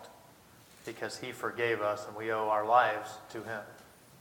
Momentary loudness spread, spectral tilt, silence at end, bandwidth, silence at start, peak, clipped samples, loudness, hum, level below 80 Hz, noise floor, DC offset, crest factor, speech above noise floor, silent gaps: 19 LU; -4 dB/octave; 0.05 s; 19 kHz; 0 s; -10 dBFS; under 0.1%; -32 LUFS; none; -74 dBFS; -58 dBFS; under 0.1%; 24 dB; 26 dB; none